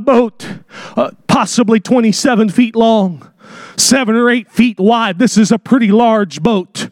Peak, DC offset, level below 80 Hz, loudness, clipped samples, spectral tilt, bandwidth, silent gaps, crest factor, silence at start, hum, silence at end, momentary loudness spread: 0 dBFS; under 0.1%; -50 dBFS; -12 LUFS; under 0.1%; -4.5 dB/octave; 16 kHz; none; 12 dB; 0 s; none; 0.05 s; 9 LU